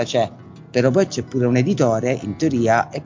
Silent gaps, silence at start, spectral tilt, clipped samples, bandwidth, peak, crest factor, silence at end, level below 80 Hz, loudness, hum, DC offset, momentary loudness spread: none; 0 s; -6.5 dB/octave; under 0.1%; 7.6 kHz; -4 dBFS; 16 dB; 0 s; -52 dBFS; -19 LUFS; none; under 0.1%; 5 LU